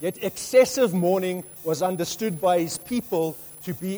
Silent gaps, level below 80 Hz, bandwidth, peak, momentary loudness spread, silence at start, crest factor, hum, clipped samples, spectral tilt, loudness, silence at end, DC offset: none; -62 dBFS; over 20 kHz; -6 dBFS; 11 LU; 0 s; 18 dB; none; under 0.1%; -5 dB/octave; -24 LUFS; 0 s; under 0.1%